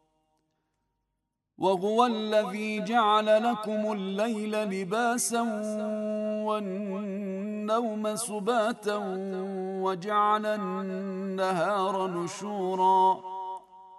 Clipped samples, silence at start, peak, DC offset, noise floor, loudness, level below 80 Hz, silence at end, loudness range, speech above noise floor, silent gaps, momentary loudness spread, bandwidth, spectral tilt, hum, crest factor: under 0.1%; 1.6 s; -10 dBFS; under 0.1%; -82 dBFS; -28 LUFS; -82 dBFS; 0 s; 4 LU; 54 dB; none; 10 LU; 12.5 kHz; -4.5 dB/octave; none; 20 dB